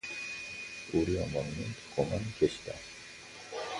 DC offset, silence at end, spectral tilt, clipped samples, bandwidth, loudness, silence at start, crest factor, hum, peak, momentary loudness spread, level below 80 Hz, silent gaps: under 0.1%; 0 s; -5.5 dB/octave; under 0.1%; 11.5 kHz; -35 LUFS; 0.05 s; 22 dB; none; -14 dBFS; 14 LU; -52 dBFS; none